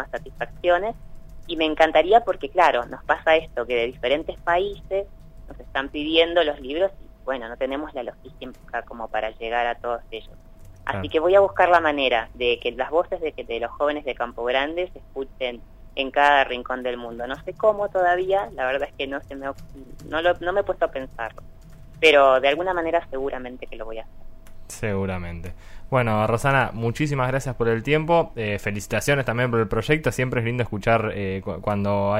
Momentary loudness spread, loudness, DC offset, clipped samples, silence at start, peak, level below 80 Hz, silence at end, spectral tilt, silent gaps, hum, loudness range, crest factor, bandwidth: 16 LU; -23 LUFS; under 0.1%; under 0.1%; 0 s; -2 dBFS; -42 dBFS; 0 s; -5.5 dB/octave; none; none; 7 LU; 20 dB; 16 kHz